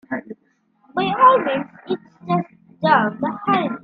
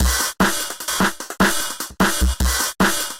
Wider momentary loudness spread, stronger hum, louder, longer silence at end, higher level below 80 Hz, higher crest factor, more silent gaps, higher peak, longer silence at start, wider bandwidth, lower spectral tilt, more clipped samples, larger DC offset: first, 15 LU vs 5 LU; neither; about the same, -19 LUFS vs -19 LUFS; about the same, 0.05 s vs 0 s; second, -64 dBFS vs -26 dBFS; first, 20 dB vs 14 dB; neither; first, 0 dBFS vs -4 dBFS; about the same, 0.1 s vs 0 s; second, 5.2 kHz vs 17 kHz; first, -9 dB/octave vs -3 dB/octave; neither; neither